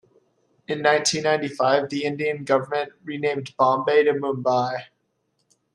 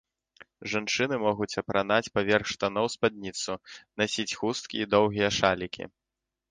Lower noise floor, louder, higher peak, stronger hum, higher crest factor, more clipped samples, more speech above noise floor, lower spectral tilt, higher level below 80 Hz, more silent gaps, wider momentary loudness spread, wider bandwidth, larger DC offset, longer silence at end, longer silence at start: second, -72 dBFS vs -87 dBFS; first, -22 LUFS vs -28 LUFS; about the same, -4 dBFS vs -6 dBFS; neither; second, 18 dB vs 24 dB; neither; second, 50 dB vs 59 dB; about the same, -4 dB/octave vs -4 dB/octave; second, -70 dBFS vs -58 dBFS; neither; about the same, 9 LU vs 11 LU; first, 12 kHz vs 10 kHz; neither; first, 0.9 s vs 0.65 s; about the same, 0.7 s vs 0.6 s